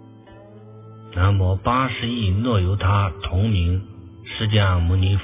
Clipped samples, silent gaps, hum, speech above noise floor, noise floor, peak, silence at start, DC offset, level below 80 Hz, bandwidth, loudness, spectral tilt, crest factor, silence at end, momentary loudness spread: under 0.1%; none; none; 25 dB; -44 dBFS; -4 dBFS; 0.3 s; under 0.1%; -30 dBFS; 3.8 kHz; -21 LUFS; -11 dB/octave; 16 dB; 0 s; 9 LU